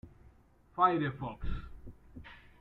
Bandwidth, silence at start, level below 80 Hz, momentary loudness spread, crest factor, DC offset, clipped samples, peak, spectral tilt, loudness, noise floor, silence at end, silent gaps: 5.4 kHz; 0.05 s; -48 dBFS; 25 LU; 22 dB; under 0.1%; under 0.1%; -14 dBFS; -9 dB/octave; -33 LUFS; -62 dBFS; 0.25 s; none